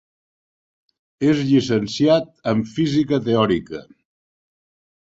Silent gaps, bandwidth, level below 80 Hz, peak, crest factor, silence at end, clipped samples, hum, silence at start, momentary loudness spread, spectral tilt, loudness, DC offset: none; 7.8 kHz; -54 dBFS; -4 dBFS; 18 dB; 1.2 s; under 0.1%; none; 1.2 s; 6 LU; -6.5 dB/octave; -19 LUFS; under 0.1%